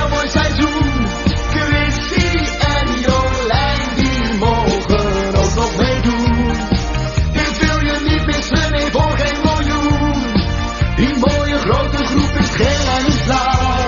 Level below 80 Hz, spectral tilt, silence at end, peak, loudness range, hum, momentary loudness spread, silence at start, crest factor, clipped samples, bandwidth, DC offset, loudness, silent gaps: -22 dBFS; -4.5 dB/octave; 0 s; 0 dBFS; 1 LU; none; 2 LU; 0 s; 14 dB; under 0.1%; 7.2 kHz; under 0.1%; -16 LUFS; none